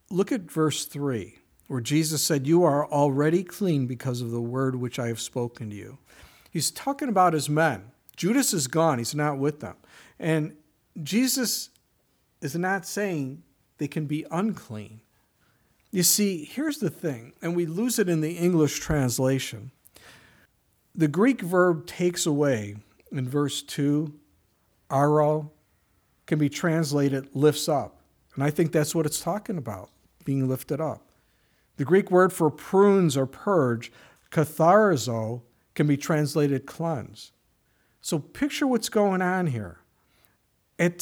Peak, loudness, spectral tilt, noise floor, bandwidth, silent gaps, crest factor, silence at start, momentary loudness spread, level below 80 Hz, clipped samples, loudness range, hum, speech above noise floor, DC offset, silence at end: -6 dBFS; -25 LUFS; -5 dB/octave; -68 dBFS; over 20 kHz; none; 20 dB; 0.1 s; 15 LU; -58 dBFS; under 0.1%; 5 LU; none; 44 dB; under 0.1%; 0 s